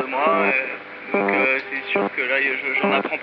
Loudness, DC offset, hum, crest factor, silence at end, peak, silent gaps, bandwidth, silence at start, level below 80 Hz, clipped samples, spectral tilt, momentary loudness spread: -20 LUFS; under 0.1%; none; 18 dB; 0 s; -4 dBFS; none; 5.6 kHz; 0 s; -80 dBFS; under 0.1%; -2 dB/octave; 6 LU